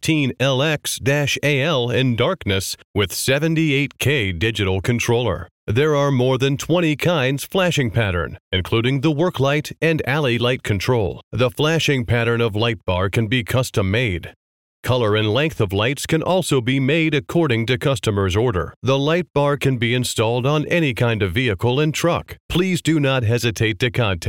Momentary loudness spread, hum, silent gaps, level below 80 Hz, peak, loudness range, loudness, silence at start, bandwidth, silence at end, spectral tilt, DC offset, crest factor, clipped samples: 4 LU; none; 2.84-2.94 s, 5.51-5.67 s, 8.40-8.51 s, 11.23-11.31 s, 14.36-14.83 s, 18.76-18.82 s, 22.40-22.49 s; -44 dBFS; -6 dBFS; 1 LU; -19 LUFS; 0.05 s; 17 kHz; 0 s; -5.5 dB/octave; 0.2%; 14 dB; under 0.1%